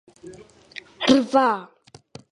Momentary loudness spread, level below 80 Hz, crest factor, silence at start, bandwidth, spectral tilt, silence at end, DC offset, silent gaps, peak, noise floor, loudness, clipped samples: 23 LU; -60 dBFS; 22 dB; 0.25 s; 11 kHz; -4 dB/octave; 0.7 s; under 0.1%; none; -2 dBFS; -47 dBFS; -20 LUFS; under 0.1%